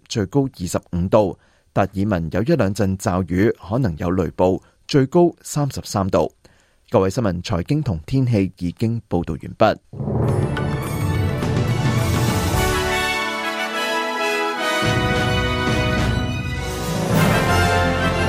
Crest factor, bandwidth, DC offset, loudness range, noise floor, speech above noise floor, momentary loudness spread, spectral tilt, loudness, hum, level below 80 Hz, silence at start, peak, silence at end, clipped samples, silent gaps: 18 dB; 16 kHz; under 0.1%; 2 LU; -54 dBFS; 35 dB; 7 LU; -5.5 dB/octave; -20 LUFS; none; -36 dBFS; 0.1 s; -2 dBFS; 0 s; under 0.1%; none